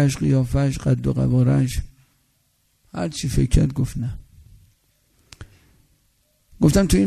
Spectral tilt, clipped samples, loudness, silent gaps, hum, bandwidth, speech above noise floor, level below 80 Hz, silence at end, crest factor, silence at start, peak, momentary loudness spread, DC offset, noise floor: -6.5 dB/octave; under 0.1%; -21 LUFS; none; none; 13.5 kHz; 46 dB; -32 dBFS; 0 s; 18 dB; 0 s; -2 dBFS; 12 LU; under 0.1%; -65 dBFS